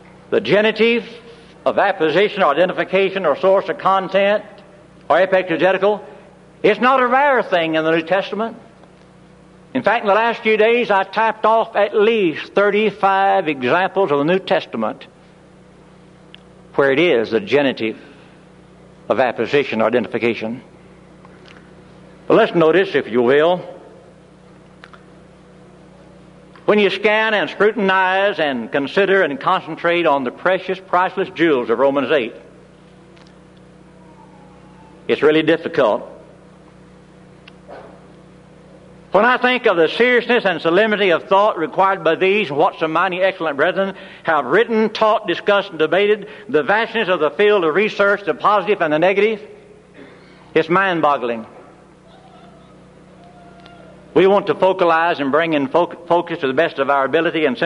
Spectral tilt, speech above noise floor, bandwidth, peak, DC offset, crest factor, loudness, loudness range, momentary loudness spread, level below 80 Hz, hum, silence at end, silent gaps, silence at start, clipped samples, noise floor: -6 dB/octave; 29 dB; 10.5 kHz; -2 dBFS; under 0.1%; 16 dB; -16 LUFS; 6 LU; 7 LU; -60 dBFS; none; 0 s; none; 0.3 s; under 0.1%; -45 dBFS